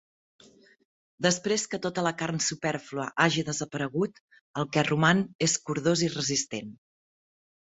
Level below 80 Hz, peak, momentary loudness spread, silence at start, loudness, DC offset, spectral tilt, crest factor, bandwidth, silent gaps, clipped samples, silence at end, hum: -66 dBFS; -6 dBFS; 10 LU; 1.2 s; -27 LUFS; under 0.1%; -3.5 dB/octave; 24 dB; 8.2 kHz; 4.20-4.28 s, 4.41-4.54 s, 5.35-5.39 s; under 0.1%; 0.95 s; none